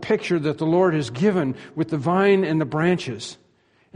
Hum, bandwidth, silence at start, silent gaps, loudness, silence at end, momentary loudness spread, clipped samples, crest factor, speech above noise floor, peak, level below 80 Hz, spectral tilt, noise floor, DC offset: none; 10.5 kHz; 0 s; none; -21 LUFS; 0.6 s; 10 LU; under 0.1%; 16 dB; 40 dB; -6 dBFS; -60 dBFS; -7 dB/octave; -61 dBFS; under 0.1%